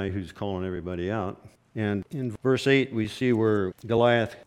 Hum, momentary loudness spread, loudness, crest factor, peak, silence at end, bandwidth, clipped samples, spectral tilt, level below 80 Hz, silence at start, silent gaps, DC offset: none; 11 LU; -26 LUFS; 18 dB; -8 dBFS; 0.05 s; 13.5 kHz; under 0.1%; -7 dB/octave; -56 dBFS; 0 s; none; under 0.1%